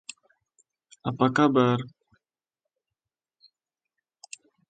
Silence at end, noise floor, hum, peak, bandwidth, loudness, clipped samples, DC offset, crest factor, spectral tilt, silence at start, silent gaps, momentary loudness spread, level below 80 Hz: 2.8 s; -89 dBFS; none; -6 dBFS; 9.2 kHz; -24 LUFS; under 0.1%; under 0.1%; 24 dB; -6.5 dB/octave; 1.05 s; none; 24 LU; -70 dBFS